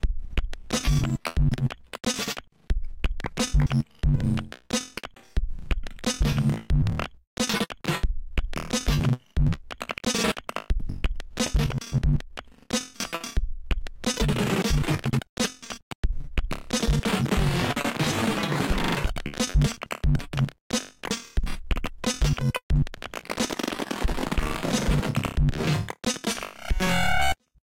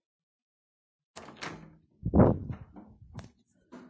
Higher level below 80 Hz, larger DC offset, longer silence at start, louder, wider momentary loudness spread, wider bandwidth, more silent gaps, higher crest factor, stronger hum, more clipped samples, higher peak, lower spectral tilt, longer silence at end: first, -30 dBFS vs -44 dBFS; neither; second, 0.05 s vs 1.15 s; about the same, -27 LUFS vs -27 LUFS; second, 9 LU vs 26 LU; first, 16.5 kHz vs 8 kHz; first, 7.27-7.37 s, 15.29-15.37 s, 15.83-16.03 s, 20.61-20.70 s, 22.63-22.69 s vs none; second, 14 dB vs 26 dB; neither; neither; second, -12 dBFS vs -6 dBFS; second, -4.5 dB/octave vs -8.5 dB/octave; first, 0.35 s vs 0.1 s